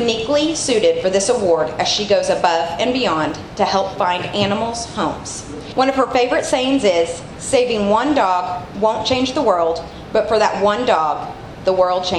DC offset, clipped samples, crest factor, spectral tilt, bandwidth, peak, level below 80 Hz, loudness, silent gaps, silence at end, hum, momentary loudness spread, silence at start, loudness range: under 0.1%; under 0.1%; 18 dB; -3.5 dB/octave; 12 kHz; 0 dBFS; -44 dBFS; -17 LUFS; none; 0 s; none; 7 LU; 0 s; 2 LU